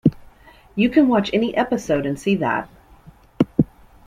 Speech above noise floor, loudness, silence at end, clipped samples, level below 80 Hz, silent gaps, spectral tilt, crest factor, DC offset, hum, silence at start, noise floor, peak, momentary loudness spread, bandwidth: 29 dB; -20 LUFS; 0.4 s; under 0.1%; -48 dBFS; none; -7 dB/octave; 18 dB; under 0.1%; none; 0.05 s; -48 dBFS; -2 dBFS; 10 LU; 14 kHz